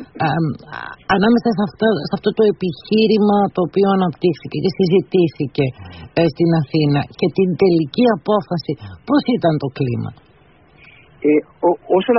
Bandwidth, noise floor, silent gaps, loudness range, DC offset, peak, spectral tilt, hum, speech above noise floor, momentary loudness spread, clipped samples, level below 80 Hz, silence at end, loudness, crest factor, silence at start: 6 kHz; -50 dBFS; none; 4 LU; under 0.1%; -2 dBFS; -6 dB/octave; none; 34 dB; 9 LU; under 0.1%; -50 dBFS; 0 s; -17 LUFS; 16 dB; 0 s